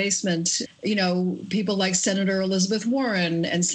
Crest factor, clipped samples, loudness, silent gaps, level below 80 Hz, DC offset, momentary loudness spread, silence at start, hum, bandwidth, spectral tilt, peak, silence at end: 14 dB; under 0.1%; -23 LUFS; none; -66 dBFS; under 0.1%; 4 LU; 0 s; none; 9.4 kHz; -3.5 dB/octave; -10 dBFS; 0 s